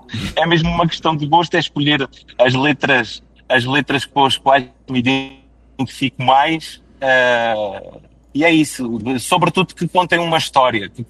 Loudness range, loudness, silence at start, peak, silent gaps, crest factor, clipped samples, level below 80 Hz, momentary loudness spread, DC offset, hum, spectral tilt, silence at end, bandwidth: 2 LU; -16 LUFS; 0.1 s; 0 dBFS; none; 16 dB; under 0.1%; -44 dBFS; 10 LU; under 0.1%; none; -5 dB/octave; 0.05 s; 12.5 kHz